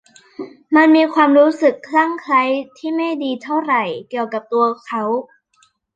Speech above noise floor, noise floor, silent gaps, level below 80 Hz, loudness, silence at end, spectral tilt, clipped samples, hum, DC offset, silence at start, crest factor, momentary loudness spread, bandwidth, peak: 43 dB; -59 dBFS; none; -72 dBFS; -16 LUFS; 0.7 s; -5.5 dB/octave; under 0.1%; none; under 0.1%; 0.4 s; 16 dB; 12 LU; 7.8 kHz; -2 dBFS